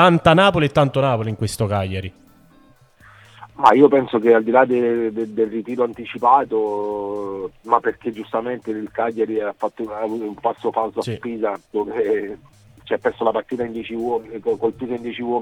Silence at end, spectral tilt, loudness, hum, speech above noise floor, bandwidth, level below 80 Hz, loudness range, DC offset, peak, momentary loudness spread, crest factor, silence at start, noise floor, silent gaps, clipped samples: 0 s; -6.5 dB/octave; -20 LUFS; none; 33 dB; 13 kHz; -52 dBFS; 7 LU; under 0.1%; 0 dBFS; 12 LU; 20 dB; 0 s; -52 dBFS; none; under 0.1%